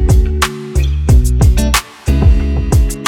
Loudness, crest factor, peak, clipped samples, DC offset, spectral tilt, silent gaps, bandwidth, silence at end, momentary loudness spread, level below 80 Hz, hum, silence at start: -13 LUFS; 10 dB; 0 dBFS; under 0.1%; under 0.1%; -5.5 dB/octave; none; 17 kHz; 0 s; 5 LU; -12 dBFS; none; 0 s